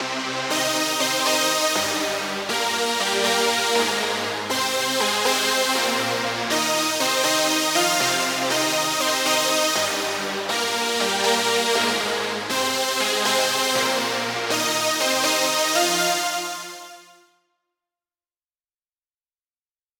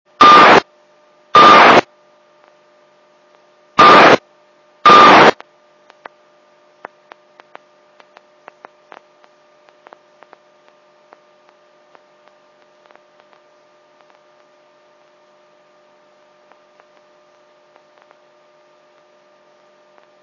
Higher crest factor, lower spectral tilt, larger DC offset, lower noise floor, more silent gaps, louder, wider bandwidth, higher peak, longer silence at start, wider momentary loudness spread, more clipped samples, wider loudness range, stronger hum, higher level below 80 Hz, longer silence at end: about the same, 16 dB vs 16 dB; second, -1 dB/octave vs -3.5 dB/octave; neither; first, under -90 dBFS vs -52 dBFS; neither; second, -20 LUFS vs -7 LUFS; first, 18 kHz vs 8 kHz; second, -6 dBFS vs 0 dBFS; second, 0 s vs 0.2 s; second, 5 LU vs 8 LU; second, under 0.1% vs 0.3%; about the same, 3 LU vs 3 LU; neither; second, -68 dBFS vs -58 dBFS; second, 2.95 s vs 14.9 s